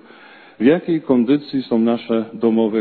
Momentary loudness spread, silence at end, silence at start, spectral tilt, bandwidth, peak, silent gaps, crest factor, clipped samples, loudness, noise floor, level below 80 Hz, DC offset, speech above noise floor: 4 LU; 0 s; 0.6 s; -10.5 dB/octave; 4.5 kHz; -2 dBFS; none; 16 dB; under 0.1%; -18 LUFS; -43 dBFS; -62 dBFS; under 0.1%; 27 dB